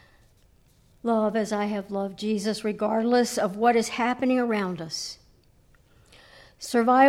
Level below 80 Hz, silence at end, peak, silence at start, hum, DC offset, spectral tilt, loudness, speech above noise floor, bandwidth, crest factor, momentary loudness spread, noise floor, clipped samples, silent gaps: -62 dBFS; 0 s; -6 dBFS; 1.05 s; none; under 0.1%; -4.5 dB/octave; -26 LUFS; 35 dB; 15.5 kHz; 18 dB; 10 LU; -59 dBFS; under 0.1%; none